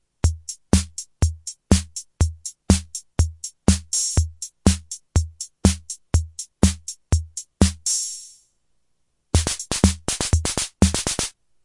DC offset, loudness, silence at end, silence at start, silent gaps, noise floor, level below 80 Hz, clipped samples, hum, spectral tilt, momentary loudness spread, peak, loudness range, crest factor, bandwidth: under 0.1%; -22 LUFS; 0.35 s; 0.25 s; none; -72 dBFS; -30 dBFS; under 0.1%; none; -4.5 dB/octave; 10 LU; 0 dBFS; 2 LU; 22 dB; 11.5 kHz